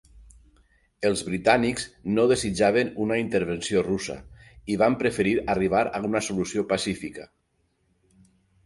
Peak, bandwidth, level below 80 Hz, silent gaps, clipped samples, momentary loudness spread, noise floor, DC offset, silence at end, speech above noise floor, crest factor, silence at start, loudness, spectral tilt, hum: -6 dBFS; 11.5 kHz; -52 dBFS; none; under 0.1%; 10 LU; -71 dBFS; under 0.1%; 1.4 s; 46 dB; 20 dB; 0.15 s; -25 LUFS; -5 dB/octave; none